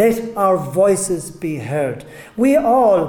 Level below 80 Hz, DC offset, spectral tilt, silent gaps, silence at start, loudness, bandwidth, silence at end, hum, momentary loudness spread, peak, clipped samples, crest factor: -50 dBFS; under 0.1%; -6 dB/octave; none; 0 s; -17 LUFS; 18 kHz; 0 s; none; 12 LU; -2 dBFS; under 0.1%; 14 dB